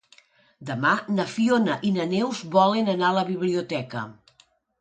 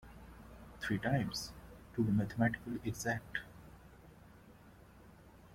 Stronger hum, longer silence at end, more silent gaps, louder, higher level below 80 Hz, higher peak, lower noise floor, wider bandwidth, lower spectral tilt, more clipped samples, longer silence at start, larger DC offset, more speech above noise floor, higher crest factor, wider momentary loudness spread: neither; first, 0.7 s vs 0 s; neither; first, -24 LUFS vs -37 LUFS; second, -70 dBFS vs -60 dBFS; first, -6 dBFS vs -20 dBFS; about the same, -62 dBFS vs -59 dBFS; second, 9.2 kHz vs 16.5 kHz; about the same, -6 dB/octave vs -5.5 dB/octave; neither; first, 0.6 s vs 0.05 s; neither; first, 38 dB vs 23 dB; about the same, 20 dB vs 18 dB; second, 13 LU vs 25 LU